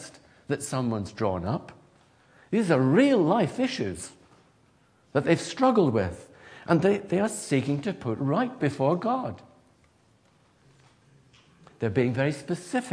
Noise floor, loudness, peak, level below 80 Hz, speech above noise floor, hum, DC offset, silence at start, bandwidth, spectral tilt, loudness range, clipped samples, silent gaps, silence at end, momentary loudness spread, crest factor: -62 dBFS; -26 LUFS; -6 dBFS; -62 dBFS; 37 dB; none; under 0.1%; 0 s; 11 kHz; -6.5 dB/octave; 7 LU; under 0.1%; none; 0 s; 12 LU; 20 dB